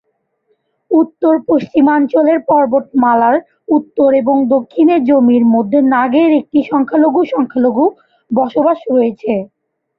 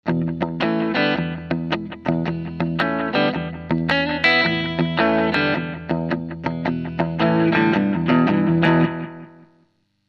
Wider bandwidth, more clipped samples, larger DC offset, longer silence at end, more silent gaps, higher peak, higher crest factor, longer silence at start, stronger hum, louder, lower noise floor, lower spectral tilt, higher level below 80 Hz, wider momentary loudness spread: second, 5.2 kHz vs 6.6 kHz; neither; neither; second, 0.55 s vs 0.8 s; neither; about the same, -2 dBFS vs -4 dBFS; second, 12 dB vs 18 dB; first, 0.9 s vs 0.05 s; neither; first, -12 LUFS vs -20 LUFS; about the same, -63 dBFS vs -63 dBFS; about the same, -9 dB/octave vs -8 dB/octave; second, -58 dBFS vs -48 dBFS; second, 5 LU vs 9 LU